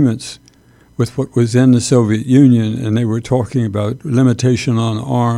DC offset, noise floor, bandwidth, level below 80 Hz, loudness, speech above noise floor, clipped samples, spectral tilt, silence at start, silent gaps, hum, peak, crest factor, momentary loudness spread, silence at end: under 0.1%; -48 dBFS; 12 kHz; -48 dBFS; -14 LUFS; 35 dB; under 0.1%; -7 dB/octave; 0 s; none; none; 0 dBFS; 14 dB; 10 LU; 0 s